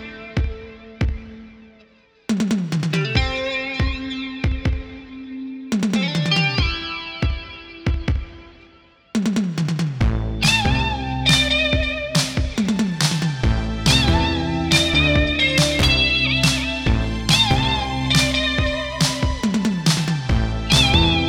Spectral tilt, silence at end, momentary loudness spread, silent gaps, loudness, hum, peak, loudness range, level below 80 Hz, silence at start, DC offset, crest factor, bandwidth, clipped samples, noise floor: -4 dB/octave; 0 s; 12 LU; none; -19 LUFS; none; -2 dBFS; 7 LU; -28 dBFS; 0 s; under 0.1%; 18 dB; 18.5 kHz; under 0.1%; -53 dBFS